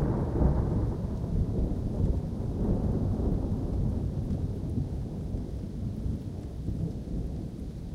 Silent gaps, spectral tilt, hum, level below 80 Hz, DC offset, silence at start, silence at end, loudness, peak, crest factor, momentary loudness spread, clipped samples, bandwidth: none; -10 dB/octave; none; -34 dBFS; under 0.1%; 0 s; 0 s; -32 LUFS; -12 dBFS; 18 dB; 8 LU; under 0.1%; 10.5 kHz